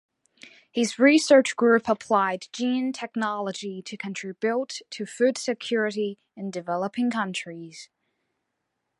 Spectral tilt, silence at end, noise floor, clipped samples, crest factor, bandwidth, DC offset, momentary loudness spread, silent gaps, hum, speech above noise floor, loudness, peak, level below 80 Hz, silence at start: -4 dB/octave; 1.15 s; -80 dBFS; under 0.1%; 20 dB; 11.5 kHz; under 0.1%; 16 LU; none; none; 55 dB; -25 LUFS; -6 dBFS; -74 dBFS; 0.45 s